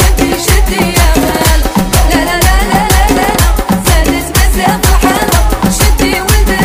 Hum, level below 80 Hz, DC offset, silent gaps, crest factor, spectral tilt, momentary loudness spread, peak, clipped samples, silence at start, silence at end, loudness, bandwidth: none; -12 dBFS; under 0.1%; none; 8 dB; -4 dB/octave; 2 LU; 0 dBFS; 0.5%; 0 s; 0 s; -9 LUFS; 16.5 kHz